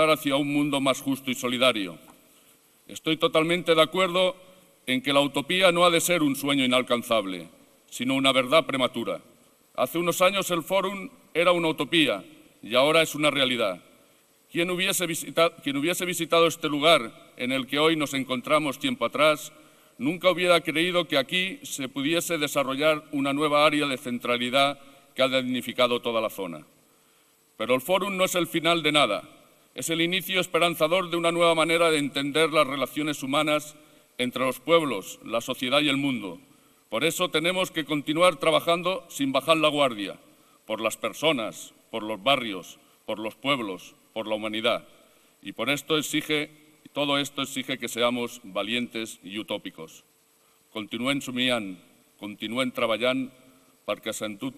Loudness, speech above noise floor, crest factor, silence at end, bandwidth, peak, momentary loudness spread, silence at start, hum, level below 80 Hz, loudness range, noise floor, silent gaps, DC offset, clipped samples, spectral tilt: -25 LUFS; 37 dB; 22 dB; 0.05 s; 15 kHz; -4 dBFS; 14 LU; 0 s; none; -66 dBFS; 6 LU; -63 dBFS; none; under 0.1%; under 0.1%; -3.5 dB/octave